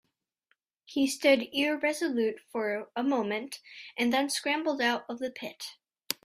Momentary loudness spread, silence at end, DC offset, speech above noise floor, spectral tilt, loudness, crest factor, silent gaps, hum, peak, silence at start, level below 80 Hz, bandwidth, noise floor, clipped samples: 14 LU; 0.1 s; under 0.1%; 46 dB; -2.5 dB/octave; -29 LUFS; 24 dB; none; none; -6 dBFS; 0.9 s; -76 dBFS; 15.5 kHz; -76 dBFS; under 0.1%